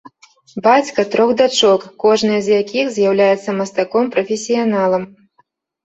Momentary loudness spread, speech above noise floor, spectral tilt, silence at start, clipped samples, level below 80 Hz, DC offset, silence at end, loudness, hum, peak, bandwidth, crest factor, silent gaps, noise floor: 6 LU; 45 dB; -4 dB/octave; 0.55 s; under 0.1%; -62 dBFS; under 0.1%; 0.8 s; -15 LUFS; none; -2 dBFS; 8.2 kHz; 14 dB; none; -60 dBFS